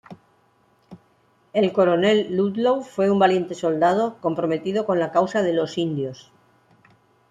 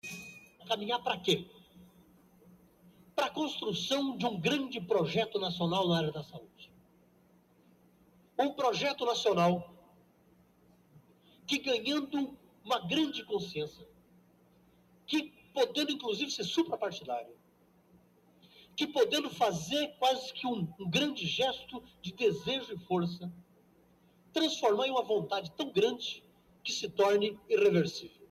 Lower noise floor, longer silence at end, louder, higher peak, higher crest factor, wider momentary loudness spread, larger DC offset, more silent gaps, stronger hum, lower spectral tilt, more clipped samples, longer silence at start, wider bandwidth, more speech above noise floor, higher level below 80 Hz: second, -61 dBFS vs -66 dBFS; first, 1.15 s vs 0.05 s; first, -21 LUFS vs -32 LUFS; first, -6 dBFS vs -14 dBFS; about the same, 18 dB vs 20 dB; second, 7 LU vs 14 LU; neither; neither; neither; first, -6.5 dB/octave vs -4.5 dB/octave; neither; about the same, 0.1 s vs 0.05 s; second, 9.8 kHz vs 15 kHz; first, 41 dB vs 34 dB; first, -66 dBFS vs -72 dBFS